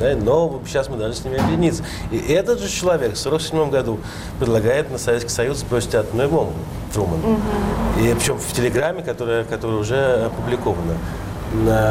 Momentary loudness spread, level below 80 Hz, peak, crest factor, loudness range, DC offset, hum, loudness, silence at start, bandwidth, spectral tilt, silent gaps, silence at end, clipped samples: 7 LU; -34 dBFS; -8 dBFS; 12 dB; 1 LU; under 0.1%; none; -20 LUFS; 0 s; 16 kHz; -5.5 dB/octave; none; 0 s; under 0.1%